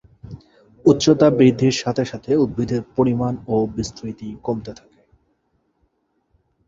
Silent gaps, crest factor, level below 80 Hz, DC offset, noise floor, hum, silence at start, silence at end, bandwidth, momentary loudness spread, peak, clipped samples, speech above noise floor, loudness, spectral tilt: none; 18 dB; -48 dBFS; under 0.1%; -68 dBFS; none; 0.25 s; 1.95 s; 7.8 kHz; 17 LU; -2 dBFS; under 0.1%; 50 dB; -19 LUFS; -6.5 dB/octave